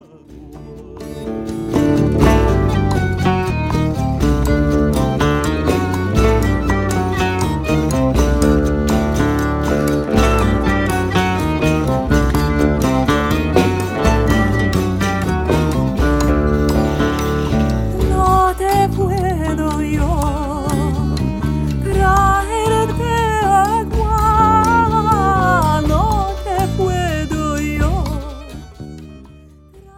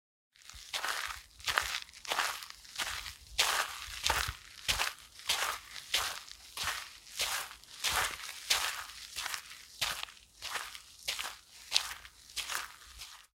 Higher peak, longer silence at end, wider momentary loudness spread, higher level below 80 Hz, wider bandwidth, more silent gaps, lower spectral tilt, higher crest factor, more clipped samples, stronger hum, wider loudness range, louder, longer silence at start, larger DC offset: about the same, 0 dBFS vs -2 dBFS; about the same, 0.15 s vs 0.15 s; second, 6 LU vs 14 LU; first, -22 dBFS vs -58 dBFS; about the same, 16.5 kHz vs 17 kHz; neither; first, -6.5 dB/octave vs 0.5 dB/octave; second, 16 dB vs 36 dB; neither; neither; about the same, 3 LU vs 4 LU; first, -16 LUFS vs -35 LUFS; about the same, 0.3 s vs 0.4 s; neither